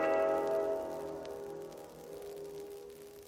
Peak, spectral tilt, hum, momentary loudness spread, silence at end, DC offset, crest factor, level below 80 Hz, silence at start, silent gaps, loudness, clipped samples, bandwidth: -18 dBFS; -5 dB/octave; none; 17 LU; 0 s; under 0.1%; 18 dB; -68 dBFS; 0 s; none; -37 LUFS; under 0.1%; 17 kHz